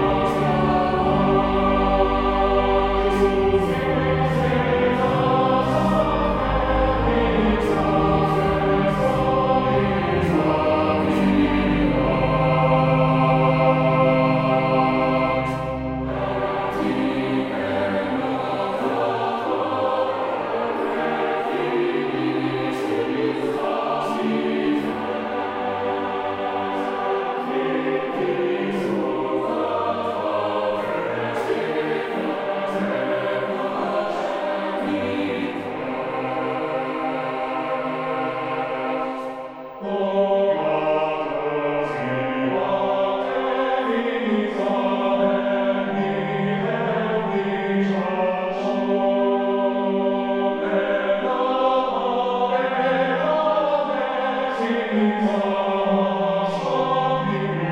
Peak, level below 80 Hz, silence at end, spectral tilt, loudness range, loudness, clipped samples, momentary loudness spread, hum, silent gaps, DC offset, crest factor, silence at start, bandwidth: -6 dBFS; -38 dBFS; 0 s; -7.5 dB/octave; 5 LU; -22 LUFS; under 0.1%; 6 LU; none; none; under 0.1%; 14 dB; 0 s; 12.5 kHz